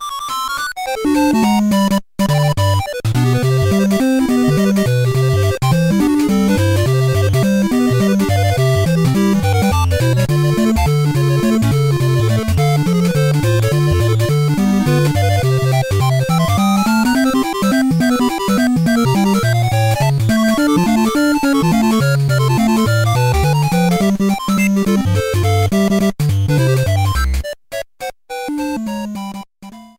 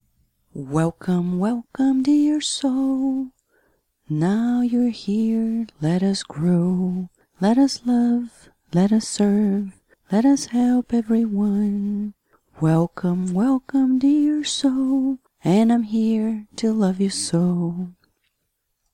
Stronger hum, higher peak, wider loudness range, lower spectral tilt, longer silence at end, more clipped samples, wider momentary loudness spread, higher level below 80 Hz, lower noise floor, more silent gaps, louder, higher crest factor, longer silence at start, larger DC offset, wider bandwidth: neither; first, -2 dBFS vs -8 dBFS; about the same, 2 LU vs 2 LU; about the same, -6.5 dB/octave vs -6 dB/octave; second, 0.1 s vs 1.05 s; neither; second, 5 LU vs 8 LU; first, -32 dBFS vs -58 dBFS; second, -37 dBFS vs -74 dBFS; neither; first, -14 LUFS vs -21 LUFS; about the same, 12 dB vs 14 dB; second, 0 s vs 0.55 s; first, 0.3% vs under 0.1%; first, 16.5 kHz vs 11.5 kHz